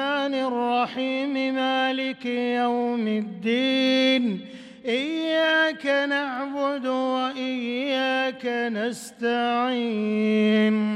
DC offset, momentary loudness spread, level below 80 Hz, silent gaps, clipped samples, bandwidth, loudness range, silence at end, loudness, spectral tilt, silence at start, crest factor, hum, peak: under 0.1%; 7 LU; -74 dBFS; none; under 0.1%; 12.5 kHz; 3 LU; 0 s; -24 LUFS; -5 dB/octave; 0 s; 14 dB; none; -10 dBFS